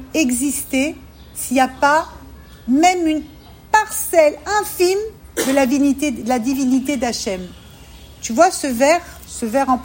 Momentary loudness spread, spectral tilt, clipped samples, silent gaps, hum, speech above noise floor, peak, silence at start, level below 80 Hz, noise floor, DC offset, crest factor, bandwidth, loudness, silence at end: 12 LU; -3 dB/octave; under 0.1%; none; none; 23 dB; 0 dBFS; 0 s; -44 dBFS; -40 dBFS; under 0.1%; 18 dB; 16.5 kHz; -17 LUFS; 0 s